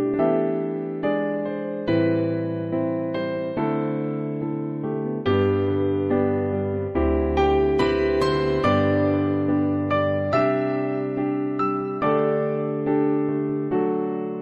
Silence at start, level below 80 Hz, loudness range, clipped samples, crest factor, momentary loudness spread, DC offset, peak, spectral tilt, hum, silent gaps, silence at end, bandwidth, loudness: 0 s; -40 dBFS; 4 LU; under 0.1%; 14 dB; 6 LU; under 0.1%; -8 dBFS; -8.5 dB/octave; none; none; 0 s; 8.2 kHz; -23 LUFS